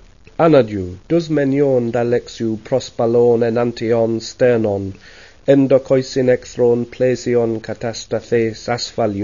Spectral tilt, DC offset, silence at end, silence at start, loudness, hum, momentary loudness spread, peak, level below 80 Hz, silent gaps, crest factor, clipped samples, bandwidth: -6.5 dB/octave; 0.3%; 0 s; 0.4 s; -17 LUFS; none; 10 LU; 0 dBFS; -48 dBFS; none; 16 dB; under 0.1%; 7.4 kHz